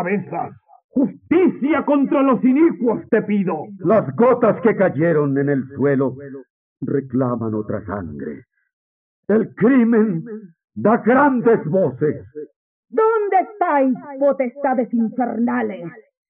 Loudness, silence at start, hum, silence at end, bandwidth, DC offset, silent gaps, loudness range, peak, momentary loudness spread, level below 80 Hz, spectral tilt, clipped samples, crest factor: -18 LUFS; 0 s; none; 0.3 s; 3.6 kHz; under 0.1%; 0.84-0.89 s, 6.50-6.76 s, 8.73-9.23 s, 10.64-10.68 s, 12.56-12.83 s; 6 LU; -4 dBFS; 17 LU; -60 dBFS; -12 dB/octave; under 0.1%; 14 dB